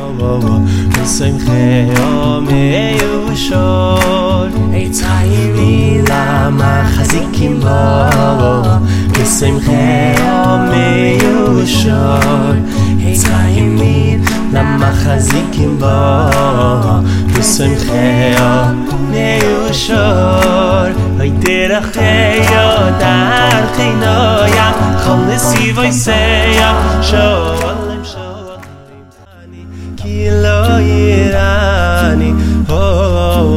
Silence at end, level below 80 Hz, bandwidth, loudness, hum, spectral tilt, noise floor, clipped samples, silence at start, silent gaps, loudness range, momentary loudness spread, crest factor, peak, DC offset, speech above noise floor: 0 s; -22 dBFS; 16.5 kHz; -11 LUFS; none; -5.5 dB/octave; -36 dBFS; under 0.1%; 0 s; none; 3 LU; 4 LU; 10 dB; 0 dBFS; under 0.1%; 27 dB